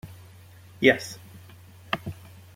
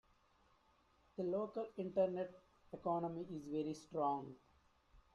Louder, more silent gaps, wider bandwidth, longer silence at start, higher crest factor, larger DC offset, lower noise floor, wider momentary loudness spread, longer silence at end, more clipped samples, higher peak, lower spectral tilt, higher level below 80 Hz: first, -25 LUFS vs -42 LUFS; neither; first, 16.5 kHz vs 11 kHz; second, 0.05 s vs 1.2 s; first, 26 dB vs 18 dB; neither; second, -49 dBFS vs -74 dBFS; first, 25 LU vs 10 LU; first, 0.4 s vs 0.15 s; neither; first, -2 dBFS vs -26 dBFS; second, -4.5 dB/octave vs -7.5 dB/octave; first, -62 dBFS vs -76 dBFS